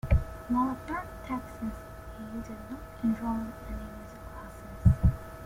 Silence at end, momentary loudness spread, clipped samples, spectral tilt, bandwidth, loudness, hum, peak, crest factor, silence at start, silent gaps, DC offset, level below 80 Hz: 0 s; 17 LU; under 0.1%; -8.5 dB/octave; 16.5 kHz; -32 LUFS; none; -8 dBFS; 22 dB; 0.05 s; none; under 0.1%; -36 dBFS